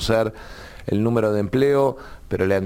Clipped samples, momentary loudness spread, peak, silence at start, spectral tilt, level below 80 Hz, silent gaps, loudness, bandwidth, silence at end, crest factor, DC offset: under 0.1%; 18 LU; -6 dBFS; 0 s; -6.5 dB/octave; -42 dBFS; none; -21 LUFS; 17 kHz; 0 s; 14 dB; under 0.1%